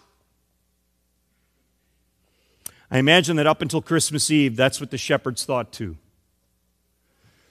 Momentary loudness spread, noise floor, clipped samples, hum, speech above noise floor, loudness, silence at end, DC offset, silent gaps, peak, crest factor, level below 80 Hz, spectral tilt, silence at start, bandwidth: 19 LU; -69 dBFS; under 0.1%; none; 48 dB; -20 LUFS; 1.55 s; under 0.1%; none; 0 dBFS; 24 dB; -58 dBFS; -4 dB/octave; 2.9 s; 15 kHz